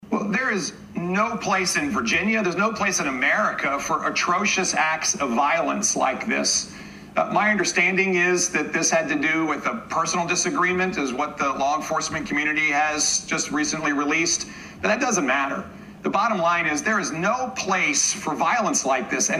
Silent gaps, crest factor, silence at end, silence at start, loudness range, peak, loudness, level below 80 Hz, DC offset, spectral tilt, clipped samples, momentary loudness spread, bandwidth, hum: none; 16 dB; 0 s; 0 s; 2 LU; -6 dBFS; -22 LUFS; -56 dBFS; under 0.1%; -2.5 dB/octave; under 0.1%; 6 LU; 14.5 kHz; none